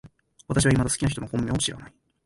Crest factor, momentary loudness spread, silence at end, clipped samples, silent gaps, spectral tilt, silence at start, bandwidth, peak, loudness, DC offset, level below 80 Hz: 16 dB; 7 LU; 0.35 s; under 0.1%; none; -4.5 dB/octave; 0.05 s; 11.5 kHz; -10 dBFS; -24 LUFS; under 0.1%; -42 dBFS